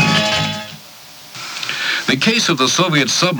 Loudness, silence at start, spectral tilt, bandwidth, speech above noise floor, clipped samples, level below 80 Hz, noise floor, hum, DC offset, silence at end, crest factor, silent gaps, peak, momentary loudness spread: -15 LUFS; 0 s; -3 dB/octave; over 20 kHz; 23 dB; under 0.1%; -52 dBFS; -38 dBFS; none; under 0.1%; 0 s; 16 dB; none; 0 dBFS; 20 LU